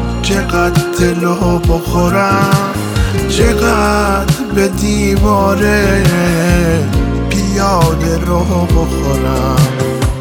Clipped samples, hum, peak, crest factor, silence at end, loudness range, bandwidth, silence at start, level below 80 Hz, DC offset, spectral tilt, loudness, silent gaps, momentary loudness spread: under 0.1%; none; 0 dBFS; 12 dB; 0 s; 1 LU; 19.5 kHz; 0 s; -20 dBFS; under 0.1%; -5.5 dB/octave; -12 LUFS; none; 4 LU